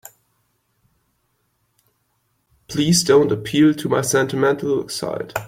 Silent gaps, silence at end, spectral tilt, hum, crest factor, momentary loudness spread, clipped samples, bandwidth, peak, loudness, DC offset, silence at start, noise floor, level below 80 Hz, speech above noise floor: none; 0 s; -4.5 dB/octave; none; 18 dB; 11 LU; under 0.1%; 16.5 kHz; -4 dBFS; -18 LUFS; under 0.1%; 2.7 s; -68 dBFS; -56 dBFS; 50 dB